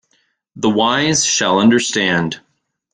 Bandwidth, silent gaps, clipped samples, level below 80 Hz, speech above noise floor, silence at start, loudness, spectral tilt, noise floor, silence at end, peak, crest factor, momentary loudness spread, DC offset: 10 kHz; none; under 0.1%; -54 dBFS; 48 dB; 0.55 s; -15 LUFS; -3 dB/octave; -63 dBFS; 0.55 s; -2 dBFS; 16 dB; 8 LU; under 0.1%